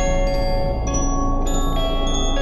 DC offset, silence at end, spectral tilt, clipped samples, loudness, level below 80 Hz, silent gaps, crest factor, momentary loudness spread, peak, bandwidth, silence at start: under 0.1%; 0 s; -4.5 dB/octave; under 0.1%; -22 LUFS; -20 dBFS; none; 10 dB; 1 LU; -8 dBFS; 12 kHz; 0 s